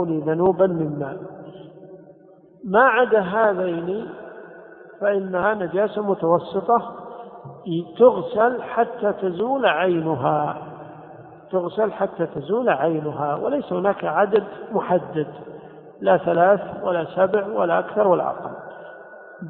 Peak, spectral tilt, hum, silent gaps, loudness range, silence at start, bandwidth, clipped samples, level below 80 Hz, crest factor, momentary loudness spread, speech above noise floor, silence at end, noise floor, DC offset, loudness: -2 dBFS; -11 dB/octave; none; none; 3 LU; 0 s; 4.2 kHz; under 0.1%; -62 dBFS; 20 dB; 21 LU; 29 dB; 0 s; -49 dBFS; under 0.1%; -21 LUFS